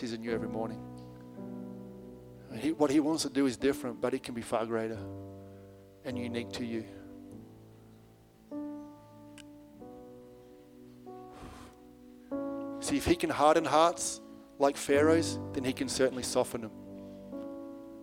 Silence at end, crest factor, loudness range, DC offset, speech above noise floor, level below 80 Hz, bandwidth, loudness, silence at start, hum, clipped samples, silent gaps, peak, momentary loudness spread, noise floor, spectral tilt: 0 s; 22 dB; 20 LU; under 0.1%; 28 dB; -60 dBFS; 16.5 kHz; -31 LUFS; 0 s; none; under 0.1%; none; -10 dBFS; 25 LU; -58 dBFS; -4.5 dB/octave